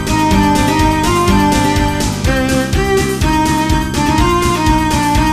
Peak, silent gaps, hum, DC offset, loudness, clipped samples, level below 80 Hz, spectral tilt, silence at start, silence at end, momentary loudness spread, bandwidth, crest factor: 0 dBFS; none; none; under 0.1%; -13 LUFS; under 0.1%; -20 dBFS; -5 dB/octave; 0 s; 0 s; 3 LU; 15.5 kHz; 12 dB